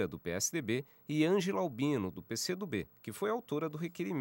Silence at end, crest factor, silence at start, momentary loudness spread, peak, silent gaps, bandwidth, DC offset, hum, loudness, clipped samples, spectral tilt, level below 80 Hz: 0 s; 18 dB; 0 s; 9 LU; -18 dBFS; none; 16 kHz; under 0.1%; none; -35 LUFS; under 0.1%; -4.5 dB/octave; -70 dBFS